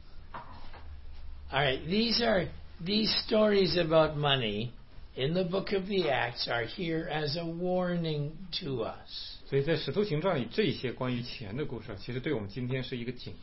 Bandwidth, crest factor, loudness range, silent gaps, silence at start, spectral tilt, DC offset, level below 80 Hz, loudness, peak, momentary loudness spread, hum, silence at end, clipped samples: 6 kHz; 18 dB; 5 LU; none; 0 s; -8.5 dB/octave; 0.3%; -48 dBFS; -31 LUFS; -12 dBFS; 16 LU; none; 0 s; under 0.1%